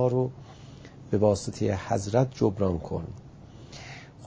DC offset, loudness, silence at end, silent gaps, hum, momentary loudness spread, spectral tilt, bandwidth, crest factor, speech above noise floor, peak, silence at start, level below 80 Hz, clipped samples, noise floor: under 0.1%; -27 LUFS; 0 s; none; none; 22 LU; -7 dB/octave; 8 kHz; 20 dB; 20 dB; -8 dBFS; 0 s; -48 dBFS; under 0.1%; -47 dBFS